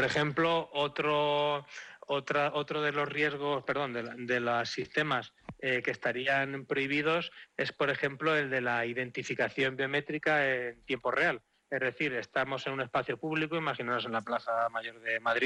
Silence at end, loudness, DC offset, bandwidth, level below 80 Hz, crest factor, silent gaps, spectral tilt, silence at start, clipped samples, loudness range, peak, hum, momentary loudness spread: 0 s; -31 LUFS; under 0.1%; 11.5 kHz; -70 dBFS; 16 dB; none; -5 dB/octave; 0 s; under 0.1%; 2 LU; -16 dBFS; none; 7 LU